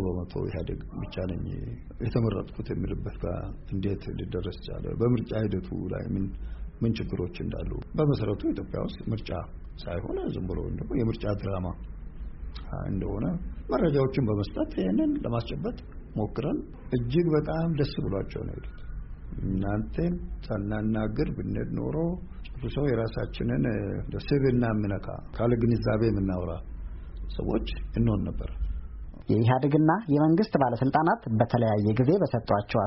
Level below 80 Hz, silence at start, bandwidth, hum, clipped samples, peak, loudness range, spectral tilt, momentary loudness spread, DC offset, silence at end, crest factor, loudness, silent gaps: -40 dBFS; 0 s; 5.8 kHz; none; under 0.1%; -10 dBFS; 7 LU; -7.5 dB/octave; 14 LU; under 0.1%; 0 s; 18 dB; -29 LUFS; none